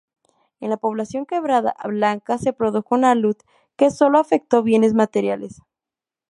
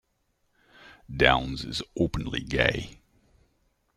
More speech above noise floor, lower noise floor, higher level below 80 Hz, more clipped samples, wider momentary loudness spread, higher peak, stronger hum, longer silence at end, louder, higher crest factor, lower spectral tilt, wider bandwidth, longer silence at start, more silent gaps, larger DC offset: first, 70 dB vs 46 dB; first, -89 dBFS vs -73 dBFS; second, -60 dBFS vs -44 dBFS; neither; second, 11 LU vs 14 LU; about the same, -2 dBFS vs -2 dBFS; neither; second, 0.8 s vs 1.05 s; first, -19 LUFS vs -26 LUFS; second, 18 dB vs 26 dB; about the same, -6 dB/octave vs -5 dB/octave; second, 11.5 kHz vs 14 kHz; second, 0.6 s vs 0.85 s; neither; neither